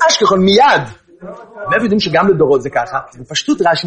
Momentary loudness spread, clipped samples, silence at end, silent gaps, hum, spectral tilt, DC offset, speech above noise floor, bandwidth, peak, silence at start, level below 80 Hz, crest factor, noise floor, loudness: 20 LU; under 0.1%; 0 s; none; none; -4 dB/octave; under 0.1%; 21 dB; 9.4 kHz; 0 dBFS; 0 s; -48 dBFS; 12 dB; -33 dBFS; -13 LUFS